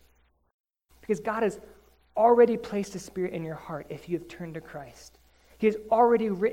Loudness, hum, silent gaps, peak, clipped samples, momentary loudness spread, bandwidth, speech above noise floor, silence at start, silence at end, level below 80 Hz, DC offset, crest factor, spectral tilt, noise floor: -26 LUFS; none; none; -8 dBFS; under 0.1%; 20 LU; 15.5 kHz; 39 dB; 1.1 s; 0 s; -60 dBFS; under 0.1%; 20 dB; -6.5 dB/octave; -65 dBFS